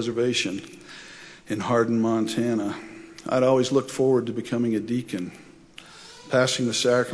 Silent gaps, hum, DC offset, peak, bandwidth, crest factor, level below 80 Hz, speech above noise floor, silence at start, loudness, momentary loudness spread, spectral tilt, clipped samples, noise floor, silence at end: none; none; under 0.1%; -8 dBFS; 11 kHz; 16 dB; -64 dBFS; 24 dB; 0 s; -24 LUFS; 20 LU; -4.5 dB/octave; under 0.1%; -47 dBFS; 0 s